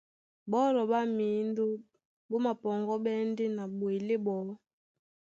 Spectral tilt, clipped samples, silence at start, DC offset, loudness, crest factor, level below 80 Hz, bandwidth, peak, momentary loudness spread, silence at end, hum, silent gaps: -7.5 dB/octave; under 0.1%; 0.45 s; under 0.1%; -32 LUFS; 16 dB; -82 dBFS; 7.6 kHz; -18 dBFS; 9 LU; 0.85 s; none; 2.05-2.29 s